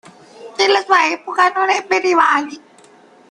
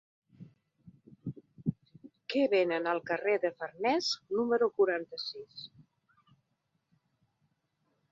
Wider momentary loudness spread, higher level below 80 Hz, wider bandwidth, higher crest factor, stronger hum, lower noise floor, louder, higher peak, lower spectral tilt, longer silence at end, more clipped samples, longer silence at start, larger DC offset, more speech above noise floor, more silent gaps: second, 6 LU vs 17 LU; first, -66 dBFS vs -74 dBFS; first, 10.5 kHz vs 7.8 kHz; about the same, 16 dB vs 18 dB; neither; second, -47 dBFS vs -80 dBFS; first, -15 LUFS vs -31 LUFS; first, 0 dBFS vs -16 dBFS; second, -1.5 dB/octave vs -5 dB/octave; second, 0.7 s vs 2.45 s; neither; about the same, 0.4 s vs 0.4 s; neither; second, 31 dB vs 49 dB; neither